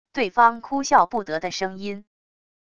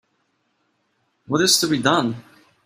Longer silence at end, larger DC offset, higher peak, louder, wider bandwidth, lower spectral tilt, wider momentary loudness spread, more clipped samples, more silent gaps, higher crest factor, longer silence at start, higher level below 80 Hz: first, 0.75 s vs 0.45 s; first, 0.5% vs under 0.1%; about the same, -2 dBFS vs -2 dBFS; second, -21 LUFS vs -18 LUFS; second, 10 kHz vs 16 kHz; about the same, -3.5 dB/octave vs -3 dB/octave; first, 15 LU vs 11 LU; neither; neither; about the same, 20 dB vs 22 dB; second, 0.15 s vs 1.3 s; about the same, -60 dBFS vs -62 dBFS